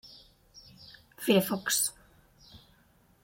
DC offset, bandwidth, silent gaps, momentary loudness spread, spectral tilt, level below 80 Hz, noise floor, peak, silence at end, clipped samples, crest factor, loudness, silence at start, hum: under 0.1%; 17 kHz; none; 25 LU; -3 dB/octave; -66 dBFS; -64 dBFS; -10 dBFS; 0.65 s; under 0.1%; 22 dB; -28 LUFS; 0.05 s; none